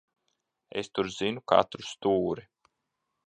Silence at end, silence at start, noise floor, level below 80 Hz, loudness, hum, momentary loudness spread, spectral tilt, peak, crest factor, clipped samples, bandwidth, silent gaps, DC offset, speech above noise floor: 0.85 s; 0.75 s; -82 dBFS; -64 dBFS; -29 LUFS; none; 12 LU; -5 dB/octave; -6 dBFS; 24 dB; under 0.1%; 9.2 kHz; none; under 0.1%; 54 dB